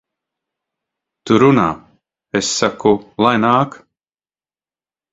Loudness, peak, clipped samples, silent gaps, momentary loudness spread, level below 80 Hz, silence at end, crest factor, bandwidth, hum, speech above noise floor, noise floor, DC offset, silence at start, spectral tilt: -15 LUFS; 0 dBFS; under 0.1%; none; 10 LU; -52 dBFS; 1.35 s; 18 dB; 8 kHz; none; over 76 dB; under -90 dBFS; under 0.1%; 1.25 s; -5 dB/octave